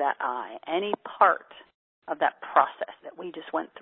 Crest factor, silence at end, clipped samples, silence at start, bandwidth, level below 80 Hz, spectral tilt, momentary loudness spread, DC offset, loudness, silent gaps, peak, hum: 24 dB; 0 s; under 0.1%; 0 s; 4.2 kHz; -82 dBFS; -7.5 dB/octave; 15 LU; under 0.1%; -27 LUFS; 1.74-2.02 s; -4 dBFS; none